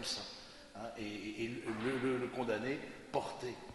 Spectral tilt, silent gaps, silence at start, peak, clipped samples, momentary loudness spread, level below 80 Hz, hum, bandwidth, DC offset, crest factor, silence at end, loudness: -4.5 dB/octave; none; 0 s; -20 dBFS; under 0.1%; 11 LU; -66 dBFS; none; 11.5 kHz; under 0.1%; 20 dB; 0 s; -40 LUFS